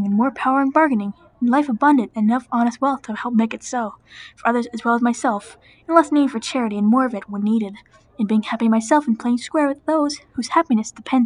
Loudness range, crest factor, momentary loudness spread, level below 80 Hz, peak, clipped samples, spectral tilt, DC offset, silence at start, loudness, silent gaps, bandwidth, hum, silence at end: 2 LU; 18 dB; 9 LU; -62 dBFS; 0 dBFS; under 0.1%; -5.5 dB/octave; under 0.1%; 0 s; -19 LUFS; none; 10.5 kHz; none; 0 s